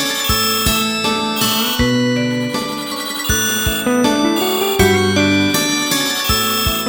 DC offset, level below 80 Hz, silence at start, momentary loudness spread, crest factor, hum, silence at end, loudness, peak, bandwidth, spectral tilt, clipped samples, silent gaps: under 0.1%; -32 dBFS; 0 s; 5 LU; 16 dB; none; 0 s; -15 LUFS; 0 dBFS; 17 kHz; -3 dB/octave; under 0.1%; none